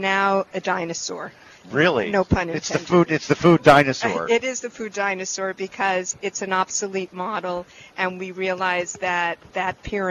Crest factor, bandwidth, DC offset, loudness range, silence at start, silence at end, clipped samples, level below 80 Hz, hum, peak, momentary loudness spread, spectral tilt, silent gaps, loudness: 20 dB; 12.5 kHz; under 0.1%; 7 LU; 0 s; 0 s; under 0.1%; -48 dBFS; none; -2 dBFS; 11 LU; -4.5 dB/octave; none; -22 LUFS